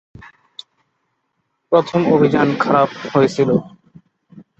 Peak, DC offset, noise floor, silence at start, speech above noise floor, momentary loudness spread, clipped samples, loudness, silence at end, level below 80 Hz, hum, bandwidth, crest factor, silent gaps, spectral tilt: -2 dBFS; under 0.1%; -70 dBFS; 1.7 s; 56 dB; 24 LU; under 0.1%; -16 LUFS; 0.9 s; -56 dBFS; none; 8.2 kHz; 16 dB; none; -7 dB/octave